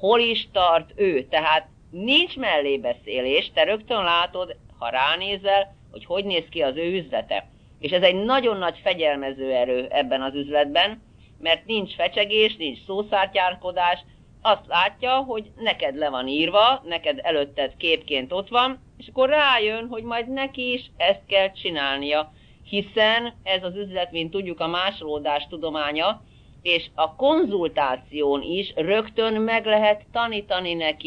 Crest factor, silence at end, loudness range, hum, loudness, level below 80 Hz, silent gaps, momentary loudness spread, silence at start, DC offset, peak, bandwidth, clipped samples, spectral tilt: 20 dB; 0 s; 3 LU; none; -22 LUFS; -54 dBFS; none; 9 LU; 0 s; under 0.1%; -4 dBFS; 6.6 kHz; under 0.1%; -5.5 dB/octave